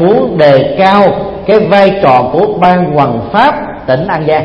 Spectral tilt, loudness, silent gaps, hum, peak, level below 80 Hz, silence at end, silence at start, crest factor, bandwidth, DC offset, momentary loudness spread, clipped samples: -8 dB/octave; -8 LUFS; none; none; 0 dBFS; -38 dBFS; 0 s; 0 s; 8 dB; 7.2 kHz; under 0.1%; 5 LU; 0.9%